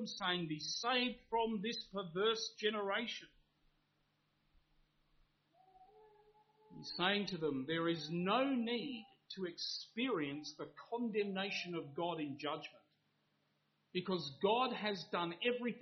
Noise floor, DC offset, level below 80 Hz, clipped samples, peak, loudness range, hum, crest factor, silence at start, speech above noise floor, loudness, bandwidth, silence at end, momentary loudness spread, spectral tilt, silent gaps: -80 dBFS; under 0.1%; -78 dBFS; under 0.1%; -20 dBFS; 6 LU; none; 22 dB; 0 s; 41 dB; -39 LUFS; 6.4 kHz; 0 s; 11 LU; -2.5 dB/octave; none